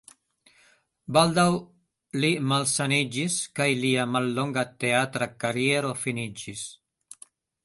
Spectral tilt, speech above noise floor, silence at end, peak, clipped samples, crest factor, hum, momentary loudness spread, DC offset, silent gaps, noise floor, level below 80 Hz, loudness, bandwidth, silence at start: -4 dB/octave; 37 dB; 0.9 s; -4 dBFS; under 0.1%; 22 dB; none; 12 LU; under 0.1%; none; -62 dBFS; -64 dBFS; -25 LUFS; 12 kHz; 1.1 s